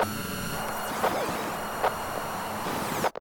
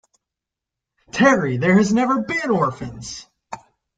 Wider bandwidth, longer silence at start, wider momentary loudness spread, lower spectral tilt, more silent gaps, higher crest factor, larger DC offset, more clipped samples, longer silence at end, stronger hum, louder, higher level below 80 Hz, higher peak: first, 18 kHz vs 9.2 kHz; second, 0 s vs 1.15 s; second, 4 LU vs 22 LU; second, -3.5 dB/octave vs -6 dB/octave; neither; about the same, 18 dB vs 18 dB; neither; neither; second, 0 s vs 0.4 s; neither; second, -30 LUFS vs -18 LUFS; about the same, -52 dBFS vs -54 dBFS; second, -12 dBFS vs -2 dBFS